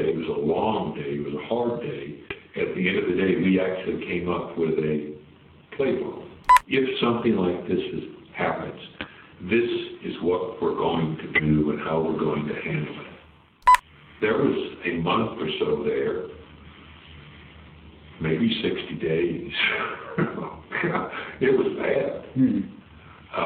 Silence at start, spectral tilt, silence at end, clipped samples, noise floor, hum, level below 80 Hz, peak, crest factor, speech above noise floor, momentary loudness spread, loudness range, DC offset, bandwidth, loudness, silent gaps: 0 s; -6.5 dB/octave; 0 s; under 0.1%; -52 dBFS; none; -52 dBFS; -2 dBFS; 24 dB; 27 dB; 14 LU; 4 LU; under 0.1%; 11.5 kHz; -25 LUFS; none